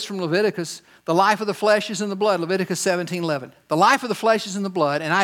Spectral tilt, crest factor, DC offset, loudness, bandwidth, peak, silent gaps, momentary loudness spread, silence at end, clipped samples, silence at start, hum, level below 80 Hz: -4 dB/octave; 18 dB; under 0.1%; -21 LUFS; 17.5 kHz; -2 dBFS; none; 9 LU; 0 s; under 0.1%; 0 s; none; -74 dBFS